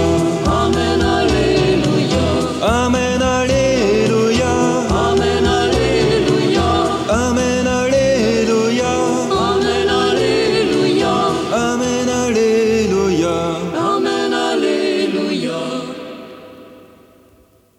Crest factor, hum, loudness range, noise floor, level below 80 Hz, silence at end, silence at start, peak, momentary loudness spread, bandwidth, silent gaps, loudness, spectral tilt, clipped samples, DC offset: 12 dB; none; 4 LU; -51 dBFS; -32 dBFS; 1 s; 0 s; -4 dBFS; 4 LU; 14.5 kHz; none; -15 LUFS; -5 dB/octave; under 0.1%; under 0.1%